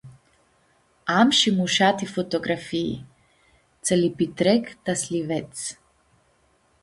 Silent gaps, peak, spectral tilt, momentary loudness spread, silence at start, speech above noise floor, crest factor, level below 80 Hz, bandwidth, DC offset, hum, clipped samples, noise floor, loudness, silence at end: none; -4 dBFS; -4 dB/octave; 14 LU; 0.05 s; 41 dB; 20 dB; -60 dBFS; 11.5 kHz; under 0.1%; none; under 0.1%; -63 dBFS; -23 LUFS; 1.1 s